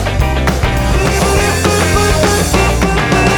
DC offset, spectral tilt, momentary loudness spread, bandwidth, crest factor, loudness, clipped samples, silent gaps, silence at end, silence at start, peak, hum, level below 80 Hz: 0.4%; -4.5 dB/octave; 3 LU; over 20 kHz; 10 dB; -12 LUFS; under 0.1%; none; 0 s; 0 s; 0 dBFS; none; -18 dBFS